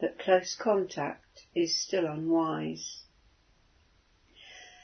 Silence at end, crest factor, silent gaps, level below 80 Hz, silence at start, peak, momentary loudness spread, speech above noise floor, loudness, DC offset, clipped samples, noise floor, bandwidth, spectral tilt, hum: 0.15 s; 20 dB; none; -70 dBFS; 0 s; -12 dBFS; 21 LU; 35 dB; -30 LUFS; under 0.1%; under 0.1%; -65 dBFS; 6.6 kHz; -4 dB/octave; none